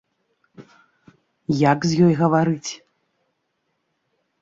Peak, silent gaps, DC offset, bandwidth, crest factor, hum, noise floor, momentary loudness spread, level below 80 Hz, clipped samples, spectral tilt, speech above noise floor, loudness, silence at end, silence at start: -4 dBFS; none; under 0.1%; 7.8 kHz; 18 dB; none; -73 dBFS; 17 LU; -60 dBFS; under 0.1%; -6.5 dB/octave; 55 dB; -19 LUFS; 1.65 s; 0.6 s